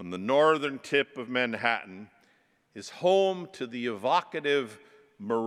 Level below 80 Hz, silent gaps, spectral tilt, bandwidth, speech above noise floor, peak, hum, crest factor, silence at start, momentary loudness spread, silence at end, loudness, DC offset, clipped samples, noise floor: -84 dBFS; none; -4.5 dB/octave; 12.5 kHz; 39 dB; -8 dBFS; none; 20 dB; 0 s; 19 LU; 0 s; -28 LUFS; under 0.1%; under 0.1%; -67 dBFS